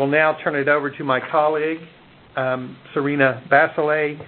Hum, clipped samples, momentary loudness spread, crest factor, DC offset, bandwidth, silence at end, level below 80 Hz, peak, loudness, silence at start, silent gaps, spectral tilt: none; under 0.1%; 10 LU; 20 dB; under 0.1%; 4.4 kHz; 0 s; -64 dBFS; -2 dBFS; -20 LUFS; 0 s; none; -10.5 dB/octave